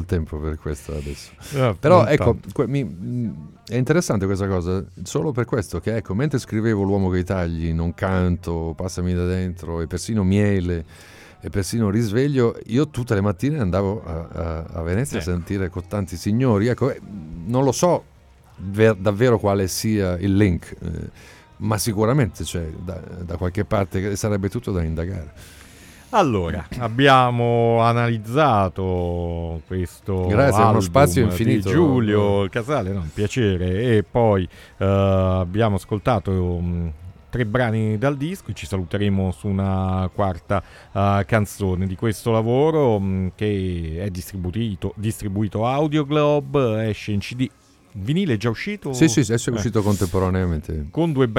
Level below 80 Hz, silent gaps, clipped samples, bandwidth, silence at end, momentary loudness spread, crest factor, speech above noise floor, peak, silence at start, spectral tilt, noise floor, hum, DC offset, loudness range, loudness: -40 dBFS; none; under 0.1%; 16.5 kHz; 0 s; 11 LU; 20 dB; 24 dB; 0 dBFS; 0 s; -6.5 dB/octave; -44 dBFS; none; under 0.1%; 5 LU; -21 LUFS